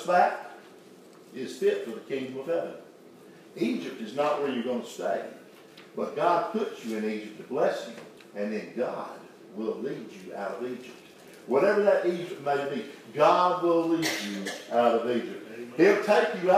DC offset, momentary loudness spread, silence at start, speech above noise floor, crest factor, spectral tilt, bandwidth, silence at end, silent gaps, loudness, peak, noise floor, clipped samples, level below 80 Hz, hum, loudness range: under 0.1%; 18 LU; 0 s; 24 dB; 20 dB; -5 dB/octave; 15.5 kHz; 0 s; none; -28 LUFS; -8 dBFS; -51 dBFS; under 0.1%; -86 dBFS; none; 8 LU